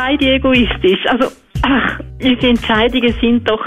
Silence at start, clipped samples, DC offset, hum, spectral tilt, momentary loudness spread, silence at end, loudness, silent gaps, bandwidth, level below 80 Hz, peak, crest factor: 0 s; under 0.1%; under 0.1%; none; -6 dB/octave; 6 LU; 0 s; -14 LUFS; none; 10.5 kHz; -30 dBFS; -2 dBFS; 12 dB